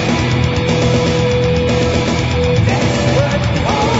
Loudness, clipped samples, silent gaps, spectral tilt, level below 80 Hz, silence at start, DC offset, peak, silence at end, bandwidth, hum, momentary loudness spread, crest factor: -14 LUFS; under 0.1%; none; -6 dB/octave; -30 dBFS; 0 s; under 0.1%; 0 dBFS; 0 s; 8 kHz; none; 2 LU; 12 dB